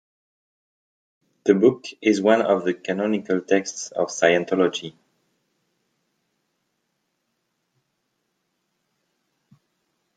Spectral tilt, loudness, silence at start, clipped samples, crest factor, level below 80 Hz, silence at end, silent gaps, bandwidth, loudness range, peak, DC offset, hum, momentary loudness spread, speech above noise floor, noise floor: -4.5 dB/octave; -21 LUFS; 1.45 s; under 0.1%; 22 dB; -72 dBFS; 5.25 s; none; 9.2 kHz; 6 LU; -2 dBFS; under 0.1%; none; 9 LU; 54 dB; -75 dBFS